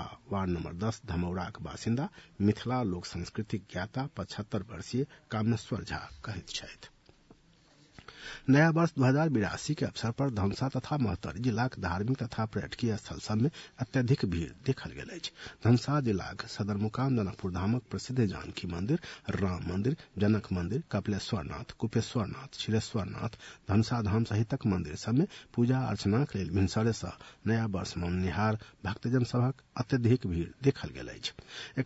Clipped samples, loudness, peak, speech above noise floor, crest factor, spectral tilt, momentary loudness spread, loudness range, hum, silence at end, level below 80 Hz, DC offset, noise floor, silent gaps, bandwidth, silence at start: under 0.1%; -32 LUFS; -12 dBFS; 31 dB; 18 dB; -6.5 dB/octave; 11 LU; 5 LU; none; 0 s; -56 dBFS; under 0.1%; -62 dBFS; none; 8 kHz; 0 s